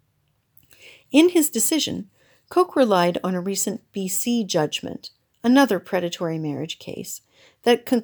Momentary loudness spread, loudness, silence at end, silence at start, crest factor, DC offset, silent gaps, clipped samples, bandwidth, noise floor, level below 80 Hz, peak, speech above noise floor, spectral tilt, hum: 15 LU; -21 LUFS; 0 s; 1.1 s; 18 dB; under 0.1%; none; under 0.1%; over 20 kHz; -68 dBFS; -68 dBFS; -4 dBFS; 47 dB; -4 dB/octave; none